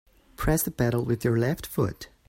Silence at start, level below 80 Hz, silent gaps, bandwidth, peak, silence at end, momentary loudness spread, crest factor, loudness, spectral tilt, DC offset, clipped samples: 0.4 s; -42 dBFS; none; 16.5 kHz; -10 dBFS; 0.25 s; 5 LU; 18 dB; -27 LUFS; -6 dB/octave; under 0.1%; under 0.1%